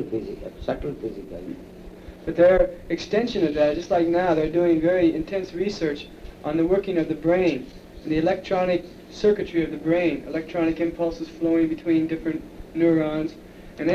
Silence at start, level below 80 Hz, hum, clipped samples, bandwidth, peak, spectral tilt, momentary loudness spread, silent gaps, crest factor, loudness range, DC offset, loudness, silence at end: 0 s; -44 dBFS; none; under 0.1%; 7.2 kHz; -8 dBFS; -7 dB/octave; 16 LU; none; 16 dB; 3 LU; under 0.1%; -23 LUFS; 0 s